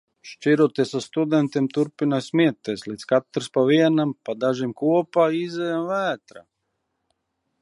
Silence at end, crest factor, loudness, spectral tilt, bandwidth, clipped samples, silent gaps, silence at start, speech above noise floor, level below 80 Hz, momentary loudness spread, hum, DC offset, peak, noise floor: 1.2 s; 18 dB; -22 LUFS; -6.5 dB/octave; 11.5 kHz; under 0.1%; none; 0.25 s; 55 dB; -72 dBFS; 8 LU; none; under 0.1%; -6 dBFS; -76 dBFS